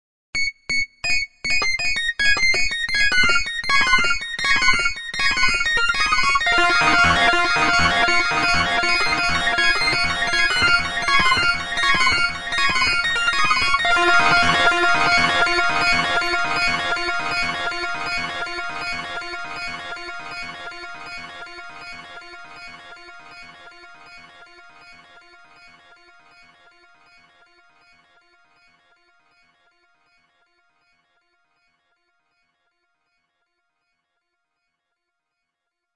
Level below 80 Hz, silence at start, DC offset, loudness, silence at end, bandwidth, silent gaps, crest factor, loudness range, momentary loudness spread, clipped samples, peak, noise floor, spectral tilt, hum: -40 dBFS; 0.35 s; under 0.1%; -18 LUFS; 0 s; 12 kHz; none; 20 dB; 17 LU; 18 LU; under 0.1%; -2 dBFS; -81 dBFS; -2 dB/octave; none